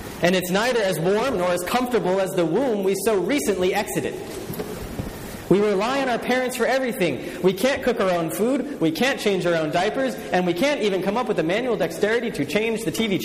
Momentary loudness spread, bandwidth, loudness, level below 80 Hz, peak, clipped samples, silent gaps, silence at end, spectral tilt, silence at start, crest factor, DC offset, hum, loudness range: 6 LU; 15.5 kHz; -22 LUFS; -50 dBFS; -4 dBFS; under 0.1%; none; 0 s; -5 dB/octave; 0 s; 18 dB; under 0.1%; none; 2 LU